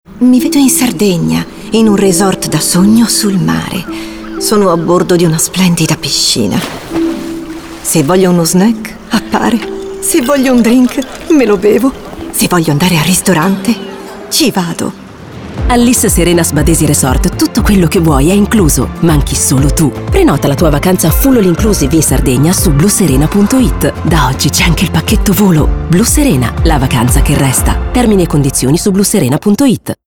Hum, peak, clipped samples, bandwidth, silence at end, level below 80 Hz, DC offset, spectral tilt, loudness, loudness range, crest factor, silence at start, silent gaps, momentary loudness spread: none; 0 dBFS; under 0.1%; 19.5 kHz; 0.15 s; -20 dBFS; under 0.1%; -5 dB/octave; -9 LUFS; 3 LU; 10 dB; 0.1 s; none; 8 LU